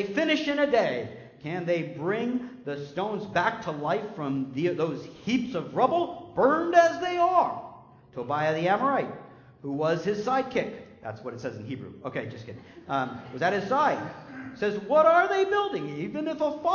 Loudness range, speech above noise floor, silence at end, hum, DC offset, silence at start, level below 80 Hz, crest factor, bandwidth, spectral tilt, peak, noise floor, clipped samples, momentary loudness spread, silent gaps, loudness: 6 LU; 23 dB; 0 s; none; under 0.1%; 0 s; -64 dBFS; 20 dB; 7.2 kHz; -6 dB/octave; -8 dBFS; -49 dBFS; under 0.1%; 17 LU; none; -27 LUFS